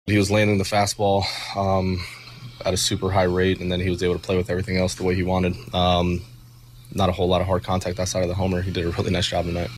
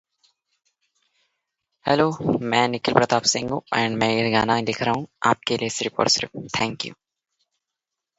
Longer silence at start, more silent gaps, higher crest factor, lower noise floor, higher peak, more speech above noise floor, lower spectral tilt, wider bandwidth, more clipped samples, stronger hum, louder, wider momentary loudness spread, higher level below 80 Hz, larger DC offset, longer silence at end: second, 0.05 s vs 1.85 s; neither; second, 14 dB vs 24 dB; second, -45 dBFS vs -85 dBFS; second, -8 dBFS vs 0 dBFS; second, 24 dB vs 63 dB; first, -5 dB/octave vs -3.5 dB/octave; first, 15 kHz vs 8.2 kHz; neither; neither; about the same, -22 LUFS vs -22 LUFS; about the same, 6 LU vs 6 LU; first, -42 dBFS vs -56 dBFS; neither; second, 0 s vs 1.25 s